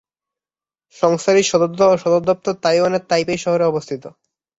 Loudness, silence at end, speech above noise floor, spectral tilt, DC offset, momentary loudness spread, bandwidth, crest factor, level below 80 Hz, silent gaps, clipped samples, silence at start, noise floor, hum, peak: -17 LUFS; 0.5 s; over 73 dB; -4.5 dB/octave; under 0.1%; 5 LU; 8 kHz; 16 dB; -58 dBFS; none; under 0.1%; 1 s; under -90 dBFS; none; -2 dBFS